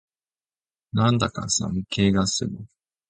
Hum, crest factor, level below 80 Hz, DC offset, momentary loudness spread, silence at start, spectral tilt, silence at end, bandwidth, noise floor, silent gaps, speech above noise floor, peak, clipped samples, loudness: none; 20 dB; -46 dBFS; under 0.1%; 9 LU; 0.95 s; -4.5 dB/octave; 0.45 s; 9.4 kHz; under -90 dBFS; none; over 67 dB; -6 dBFS; under 0.1%; -23 LUFS